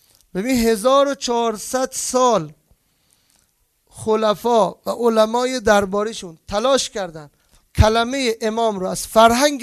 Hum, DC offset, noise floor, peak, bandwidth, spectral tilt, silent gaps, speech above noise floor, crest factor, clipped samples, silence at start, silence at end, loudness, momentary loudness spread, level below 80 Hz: none; under 0.1%; -64 dBFS; 0 dBFS; 14 kHz; -4 dB/octave; none; 46 dB; 18 dB; under 0.1%; 0.35 s; 0 s; -18 LUFS; 11 LU; -36 dBFS